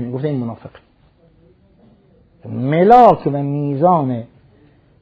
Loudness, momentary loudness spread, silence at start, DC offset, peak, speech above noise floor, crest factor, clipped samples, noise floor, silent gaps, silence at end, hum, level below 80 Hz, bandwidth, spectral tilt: -14 LUFS; 19 LU; 0 s; under 0.1%; 0 dBFS; 38 dB; 18 dB; 0.2%; -52 dBFS; none; 0.75 s; none; -52 dBFS; 8 kHz; -9.5 dB/octave